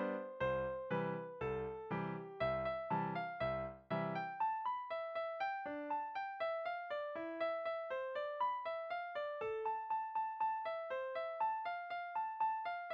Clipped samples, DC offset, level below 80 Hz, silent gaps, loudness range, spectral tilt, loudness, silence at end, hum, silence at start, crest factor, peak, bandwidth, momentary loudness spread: under 0.1%; under 0.1%; -68 dBFS; none; 1 LU; -8 dB/octave; -41 LUFS; 0 s; none; 0 s; 14 dB; -26 dBFS; 6.2 kHz; 4 LU